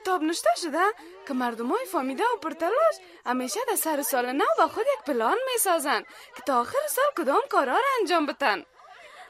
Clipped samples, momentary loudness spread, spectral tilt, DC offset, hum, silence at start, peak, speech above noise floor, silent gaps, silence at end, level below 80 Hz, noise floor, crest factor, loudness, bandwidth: under 0.1%; 6 LU; -1.5 dB/octave; under 0.1%; none; 0 s; -8 dBFS; 23 dB; none; 0 s; -74 dBFS; -48 dBFS; 18 dB; -25 LUFS; 16 kHz